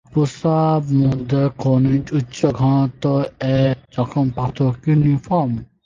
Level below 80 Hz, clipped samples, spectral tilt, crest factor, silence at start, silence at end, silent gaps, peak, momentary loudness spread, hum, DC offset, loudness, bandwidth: -44 dBFS; under 0.1%; -8.5 dB/octave; 16 dB; 0.15 s; 0.2 s; none; -2 dBFS; 4 LU; none; under 0.1%; -18 LUFS; 7.4 kHz